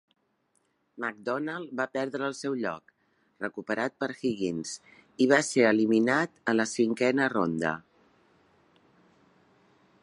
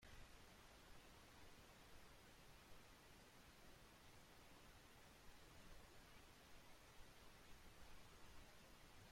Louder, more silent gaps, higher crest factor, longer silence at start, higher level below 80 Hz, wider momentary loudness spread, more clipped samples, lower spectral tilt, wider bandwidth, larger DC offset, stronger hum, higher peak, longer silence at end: first, -28 LUFS vs -66 LUFS; neither; first, 22 dB vs 14 dB; first, 0.95 s vs 0 s; about the same, -72 dBFS vs -72 dBFS; first, 13 LU vs 1 LU; neither; about the same, -4.5 dB/octave vs -3.5 dB/octave; second, 11.5 kHz vs 16.5 kHz; neither; neither; first, -6 dBFS vs -50 dBFS; first, 2.25 s vs 0 s